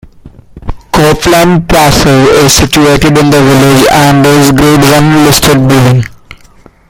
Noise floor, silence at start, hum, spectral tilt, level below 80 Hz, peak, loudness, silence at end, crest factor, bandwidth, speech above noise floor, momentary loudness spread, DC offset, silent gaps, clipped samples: -37 dBFS; 0.25 s; none; -5 dB/octave; -24 dBFS; 0 dBFS; -5 LUFS; 0.55 s; 6 dB; over 20 kHz; 33 dB; 5 LU; under 0.1%; none; 2%